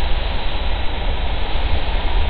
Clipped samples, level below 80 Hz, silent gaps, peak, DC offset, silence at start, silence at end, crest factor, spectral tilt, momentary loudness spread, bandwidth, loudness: under 0.1%; -20 dBFS; none; -4 dBFS; under 0.1%; 0 s; 0 s; 12 dB; -8.5 dB/octave; 2 LU; 4.7 kHz; -24 LUFS